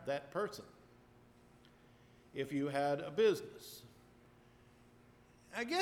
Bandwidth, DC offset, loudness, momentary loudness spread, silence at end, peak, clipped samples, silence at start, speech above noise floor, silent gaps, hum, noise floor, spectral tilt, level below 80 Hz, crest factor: 17 kHz; under 0.1%; -38 LUFS; 20 LU; 0 s; -22 dBFS; under 0.1%; 0 s; 27 dB; none; 60 Hz at -70 dBFS; -64 dBFS; -5 dB/octave; -74 dBFS; 20 dB